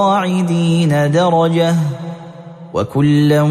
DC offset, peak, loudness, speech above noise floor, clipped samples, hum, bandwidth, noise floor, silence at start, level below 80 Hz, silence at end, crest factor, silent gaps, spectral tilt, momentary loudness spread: under 0.1%; -2 dBFS; -14 LUFS; 20 dB; under 0.1%; none; 14.5 kHz; -33 dBFS; 0 s; -50 dBFS; 0 s; 12 dB; none; -7 dB/octave; 16 LU